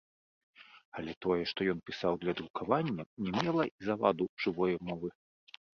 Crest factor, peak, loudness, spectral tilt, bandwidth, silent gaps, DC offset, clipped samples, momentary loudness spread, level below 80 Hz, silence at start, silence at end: 24 dB; -12 dBFS; -34 LUFS; -7 dB/octave; 7 kHz; 0.85-0.92 s, 1.17-1.21 s, 2.50-2.54 s, 3.06-3.17 s, 3.71-3.78 s, 4.29-4.37 s; under 0.1%; under 0.1%; 9 LU; -66 dBFS; 0.6 s; 0.7 s